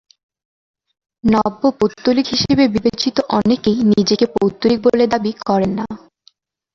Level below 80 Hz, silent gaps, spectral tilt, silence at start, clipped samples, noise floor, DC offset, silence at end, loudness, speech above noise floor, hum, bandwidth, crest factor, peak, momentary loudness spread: -46 dBFS; none; -5.5 dB/octave; 1.25 s; under 0.1%; -55 dBFS; under 0.1%; 0.75 s; -16 LUFS; 40 dB; none; 7.4 kHz; 16 dB; 0 dBFS; 6 LU